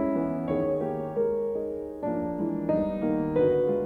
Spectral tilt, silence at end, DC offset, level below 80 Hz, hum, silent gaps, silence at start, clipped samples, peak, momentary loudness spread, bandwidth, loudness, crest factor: -10 dB/octave; 0 s; under 0.1%; -52 dBFS; none; none; 0 s; under 0.1%; -14 dBFS; 7 LU; 4.4 kHz; -28 LUFS; 14 dB